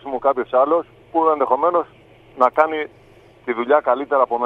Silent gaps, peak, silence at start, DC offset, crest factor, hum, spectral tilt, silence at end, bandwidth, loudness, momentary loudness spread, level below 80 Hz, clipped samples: none; 0 dBFS; 0.05 s; under 0.1%; 18 dB; none; -6.5 dB/octave; 0 s; 5.2 kHz; -19 LUFS; 10 LU; -60 dBFS; under 0.1%